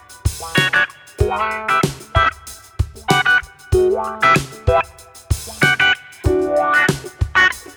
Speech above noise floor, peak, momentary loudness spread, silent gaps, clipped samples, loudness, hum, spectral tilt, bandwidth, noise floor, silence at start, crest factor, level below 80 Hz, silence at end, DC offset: 19 dB; 0 dBFS; 11 LU; none; under 0.1%; -17 LUFS; none; -4.5 dB/octave; over 20 kHz; -36 dBFS; 0.1 s; 18 dB; -30 dBFS; 0.05 s; under 0.1%